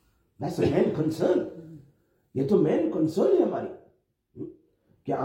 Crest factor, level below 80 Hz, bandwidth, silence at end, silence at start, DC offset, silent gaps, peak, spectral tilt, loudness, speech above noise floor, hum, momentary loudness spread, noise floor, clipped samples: 18 dB; -62 dBFS; 16 kHz; 0 s; 0.4 s; under 0.1%; none; -10 dBFS; -8 dB/octave; -25 LUFS; 41 dB; none; 19 LU; -66 dBFS; under 0.1%